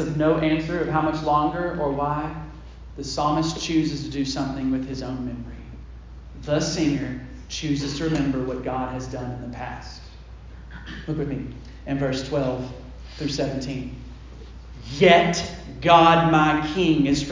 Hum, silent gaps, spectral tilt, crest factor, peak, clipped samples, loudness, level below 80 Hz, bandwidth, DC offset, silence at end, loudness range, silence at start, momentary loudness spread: none; none; -5.5 dB/octave; 22 dB; -2 dBFS; under 0.1%; -23 LUFS; -40 dBFS; 7.6 kHz; under 0.1%; 0 s; 10 LU; 0 s; 24 LU